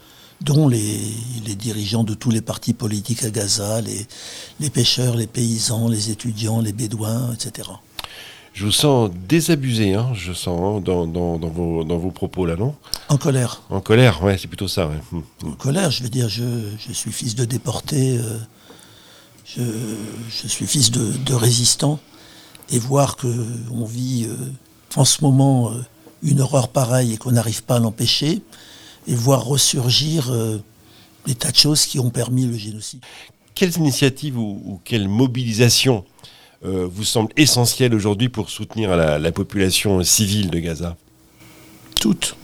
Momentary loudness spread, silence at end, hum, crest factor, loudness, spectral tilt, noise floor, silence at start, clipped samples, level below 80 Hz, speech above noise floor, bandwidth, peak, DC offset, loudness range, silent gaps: 14 LU; 0 s; none; 20 dB; -19 LUFS; -4.5 dB/octave; -48 dBFS; 0.4 s; under 0.1%; -48 dBFS; 29 dB; 17.5 kHz; 0 dBFS; under 0.1%; 5 LU; none